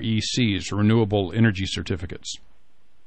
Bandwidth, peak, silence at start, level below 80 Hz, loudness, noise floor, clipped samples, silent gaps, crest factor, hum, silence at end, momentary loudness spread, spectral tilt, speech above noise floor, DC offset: 8.8 kHz; -8 dBFS; 0 s; -48 dBFS; -23 LUFS; -65 dBFS; under 0.1%; none; 16 dB; none; 0.7 s; 14 LU; -5.5 dB/octave; 43 dB; 0.9%